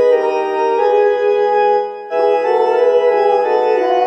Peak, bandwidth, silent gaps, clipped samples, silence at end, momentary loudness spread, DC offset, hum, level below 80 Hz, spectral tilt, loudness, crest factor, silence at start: -2 dBFS; 6.2 kHz; none; under 0.1%; 0 s; 4 LU; under 0.1%; none; -72 dBFS; -4 dB/octave; -14 LUFS; 12 dB; 0 s